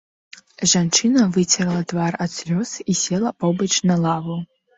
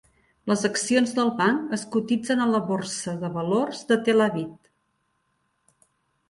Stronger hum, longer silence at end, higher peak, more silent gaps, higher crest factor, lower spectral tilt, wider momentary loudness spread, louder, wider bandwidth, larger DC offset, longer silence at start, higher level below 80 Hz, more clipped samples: neither; second, 0.3 s vs 1.75 s; first, -4 dBFS vs -8 dBFS; neither; about the same, 16 dB vs 18 dB; about the same, -4 dB/octave vs -4.5 dB/octave; about the same, 8 LU vs 8 LU; first, -19 LUFS vs -24 LUFS; second, 8 kHz vs 11.5 kHz; neither; first, 0.6 s vs 0.45 s; first, -58 dBFS vs -66 dBFS; neither